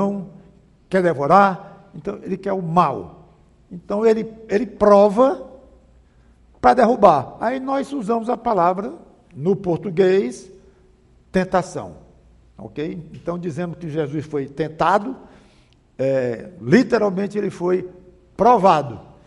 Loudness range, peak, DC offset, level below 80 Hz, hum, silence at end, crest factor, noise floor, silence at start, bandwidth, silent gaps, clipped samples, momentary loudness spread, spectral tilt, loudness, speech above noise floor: 8 LU; 0 dBFS; under 0.1%; -52 dBFS; none; 0.25 s; 20 dB; -54 dBFS; 0 s; 11.5 kHz; none; under 0.1%; 18 LU; -7 dB/octave; -19 LUFS; 36 dB